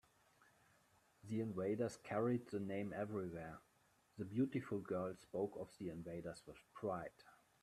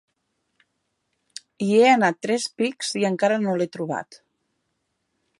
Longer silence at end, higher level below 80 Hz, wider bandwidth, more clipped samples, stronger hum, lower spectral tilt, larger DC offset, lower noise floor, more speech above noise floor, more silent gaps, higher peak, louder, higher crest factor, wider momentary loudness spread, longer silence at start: second, 0.3 s vs 1.25 s; about the same, -78 dBFS vs -76 dBFS; first, 14 kHz vs 11.5 kHz; neither; neither; first, -7.5 dB/octave vs -4.5 dB/octave; neither; about the same, -76 dBFS vs -75 dBFS; second, 32 dB vs 54 dB; neither; second, -28 dBFS vs -4 dBFS; second, -45 LUFS vs -22 LUFS; about the same, 18 dB vs 20 dB; about the same, 14 LU vs 16 LU; second, 1.25 s vs 1.6 s